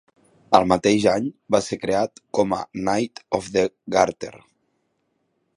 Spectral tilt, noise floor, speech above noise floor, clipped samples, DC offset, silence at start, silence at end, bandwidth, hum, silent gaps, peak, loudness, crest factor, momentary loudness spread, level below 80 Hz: -5 dB/octave; -71 dBFS; 50 dB; under 0.1%; under 0.1%; 0.5 s; 1.2 s; 11.5 kHz; none; none; 0 dBFS; -22 LUFS; 22 dB; 8 LU; -54 dBFS